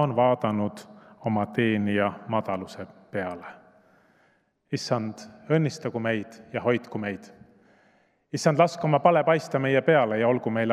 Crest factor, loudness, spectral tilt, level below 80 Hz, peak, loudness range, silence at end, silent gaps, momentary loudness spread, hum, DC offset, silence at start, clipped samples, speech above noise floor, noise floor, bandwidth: 20 dB; -25 LUFS; -6.5 dB/octave; -74 dBFS; -6 dBFS; 8 LU; 0 s; none; 14 LU; none; under 0.1%; 0 s; under 0.1%; 41 dB; -66 dBFS; 13.5 kHz